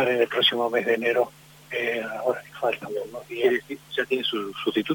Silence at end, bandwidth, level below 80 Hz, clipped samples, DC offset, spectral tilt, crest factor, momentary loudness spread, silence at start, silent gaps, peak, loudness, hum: 0 s; 17 kHz; -68 dBFS; under 0.1%; under 0.1%; -4 dB/octave; 18 dB; 10 LU; 0 s; none; -8 dBFS; -25 LUFS; none